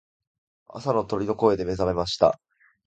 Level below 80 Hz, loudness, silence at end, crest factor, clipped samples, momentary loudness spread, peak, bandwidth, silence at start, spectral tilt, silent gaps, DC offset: -48 dBFS; -24 LUFS; 0.5 s; 22 dB; under 0.1%; 11 LU; -4 dBFS; 9 kHz; 0.7 s; -6 dB/octave; none; under 0.1%